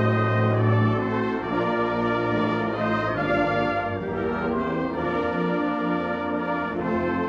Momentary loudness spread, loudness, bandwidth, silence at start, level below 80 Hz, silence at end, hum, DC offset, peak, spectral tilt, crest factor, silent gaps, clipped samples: 5 LU; -24 LUFS; 6.6 kHz; 0 s; -50 dBFS; 0 s; none; under 0.1%; -8 dBFS; -8.5 dB/octave; 14 dB; none; under 0.1%